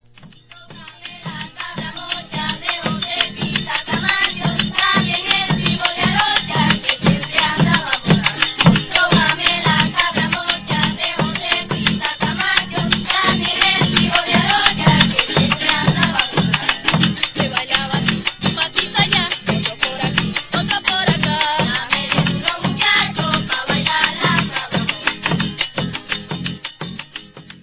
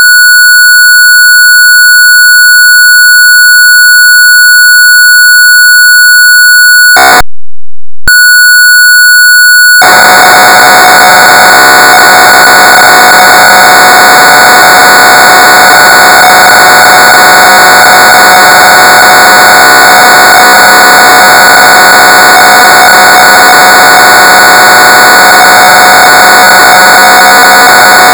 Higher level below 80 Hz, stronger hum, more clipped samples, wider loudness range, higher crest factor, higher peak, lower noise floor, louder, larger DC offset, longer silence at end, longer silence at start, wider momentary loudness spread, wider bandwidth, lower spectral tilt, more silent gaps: second, -42 dBFS vs -34 dBFS; neither; second, under 0.1% vs 50%; first, 5 LU vs 1 LU; first, 18 dB vs 0 dB; about the same, 0 dBFS vs 0 dBFS; second, -44 dBFS vs under -90 dBFS; second, -16 LUFS vs 1 LUFS; second, under 0.1% vs 0.4%; about the same, 0.05 s vs 0 s; first, 0.2 s vs 0 s; first, 10 LU vs 1 LU; second, 4 kHz vs over 20 kHz; first, -8.5 dB/octave vs 0 dB/octave; neither